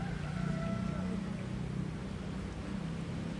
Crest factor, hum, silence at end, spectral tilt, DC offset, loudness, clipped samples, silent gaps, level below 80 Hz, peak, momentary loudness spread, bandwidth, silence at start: 14 dB; none; 0 s; -7 dB/octave; under 0.1%; -38 LUFS; under 0.1%; none; -48 dBFS; -24 dBFS; 5 LU; 11.5 kHz; 0 s